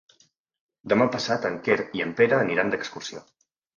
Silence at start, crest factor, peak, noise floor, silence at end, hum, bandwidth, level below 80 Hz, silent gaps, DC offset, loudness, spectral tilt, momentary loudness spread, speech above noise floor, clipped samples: 0.85 s; 22 dB; -4 dBFS; -64 dBFS; 0.6 s; none; 7.4 kHz; -66 dBFS; none; under 0.1%; -24 LUFS; -5 dB/octave; 16 LU; 40 dB; under 0.1%